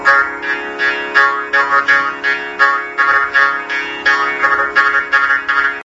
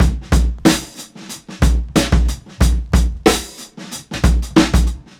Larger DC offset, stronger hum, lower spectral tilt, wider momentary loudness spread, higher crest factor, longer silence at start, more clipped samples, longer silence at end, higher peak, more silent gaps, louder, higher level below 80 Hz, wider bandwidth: neither; neither; second, -2 dB/octave vs -5 dB/octave; second, 6 LU vs 17 LU; about the same, 14 dB vs 16 dB; about the same, 0 s vs 0 s; neither; second, 0 s vs 0.2 s; about the same, 0 dBFS vs 0 dBFS; neither; first, -13 LUFS vs -17 LUFS; second, -54 dBFS vs -18 dBFS; second, 8 kHz vs 16 kHz